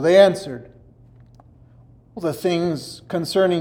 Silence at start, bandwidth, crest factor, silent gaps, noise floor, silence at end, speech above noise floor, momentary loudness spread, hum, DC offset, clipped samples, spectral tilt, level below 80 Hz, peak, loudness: 0 s; 16.5 kHz; 20 dB; none; -49 dBFS; 0 s; 31 dB; 20 LU; none; under 0.1%; under 0.1%; -5.5 dB/octave; -56 dBFS; -2 dBFS; -20 LUFS